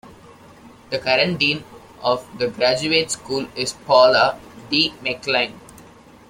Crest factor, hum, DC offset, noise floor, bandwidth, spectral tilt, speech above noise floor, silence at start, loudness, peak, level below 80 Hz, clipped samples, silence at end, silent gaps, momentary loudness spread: 20 dB; none; under 0.1%; -46 dBFS; 16 kHz; -3 dB/octave; 26 dB; 0.65 s; -19 LUFS; -2 dBFS; -56 dBFS; under 0.1%; 0.5 s; none; 12 LU